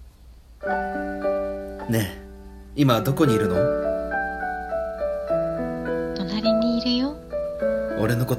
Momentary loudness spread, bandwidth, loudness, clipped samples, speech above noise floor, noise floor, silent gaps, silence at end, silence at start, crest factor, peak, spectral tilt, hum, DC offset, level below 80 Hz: 10 LU; 16 kHz; -24 LUFS; under 0.1%; 26 dB; -47 dBFS; none; 0 s; 0 s; 18 dB; -6 dBFS; -6.5 dB/octave; none; under 0.1%; -44 dBFS